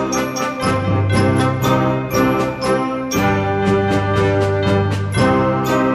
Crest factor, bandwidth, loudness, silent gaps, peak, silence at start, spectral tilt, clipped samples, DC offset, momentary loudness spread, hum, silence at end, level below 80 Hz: 12 dB; 13.5 kHz; -17 LUFS; none; -4 dBFS; 0 s; -6 dB/octave; under 0.1%; under 0.1%; 4 LU; none; 0 s; -38 dBFS